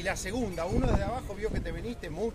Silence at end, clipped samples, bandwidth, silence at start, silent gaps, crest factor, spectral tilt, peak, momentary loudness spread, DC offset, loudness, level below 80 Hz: 0 s; under 0.1%; 15.5 kHz; 0 s; none; 18 dB; -5.5 dB/octave; -14 dBFS; 9 LU; under 0.1%; -33 LUFS; -38 dBFS